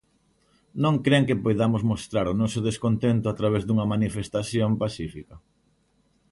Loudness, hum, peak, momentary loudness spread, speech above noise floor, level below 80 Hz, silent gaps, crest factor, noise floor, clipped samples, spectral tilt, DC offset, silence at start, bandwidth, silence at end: -24 LUFS; none; -6 dBFS; 9 LU; 43 dB; -50 dBFS; none; 18 dB; -66 dBFS; under 0.1%; -6.5 dB/octave; under 0.1%; 0.75 s; 11.5 kHz; 0.95 s